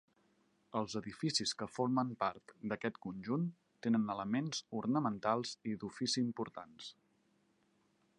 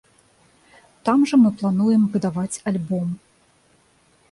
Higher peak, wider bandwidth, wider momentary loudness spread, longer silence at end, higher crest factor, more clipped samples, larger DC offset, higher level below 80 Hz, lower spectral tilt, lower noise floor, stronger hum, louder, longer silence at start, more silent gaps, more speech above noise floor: second, -18 dBFS vs -6 dBFS; about the same, 11 kHz vs 11.5 kHz; about the same, 10 LU vs 10 LU; first, 1.3 s vs 1.15 s; about the same, 20 dB vs 16 dB; neither; neither; second, -76 dBFS vs -60 dBFS; second, -4.5 dB/octave vs -7 dB/octave; first, -76 dBFS vs -59 dBFS; neither; second, -38 LUFS vs -20 LUFS; second, 0.75 s vs 1.05 s; neither; about the same, 38 dB vs 40 dB